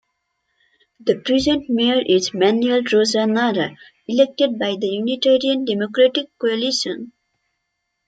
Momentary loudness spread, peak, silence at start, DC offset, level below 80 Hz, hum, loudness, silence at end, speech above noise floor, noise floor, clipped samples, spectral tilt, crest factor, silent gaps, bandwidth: 7 LU; -2 dBFS; 1.05 s; under 0.1%; -56 dBFS; none; -18 LUFS; 1 s; 57 dB; -75 dBFS; under 0.1%; -4 dB/octave; 16 dB; none; 9.2 kHz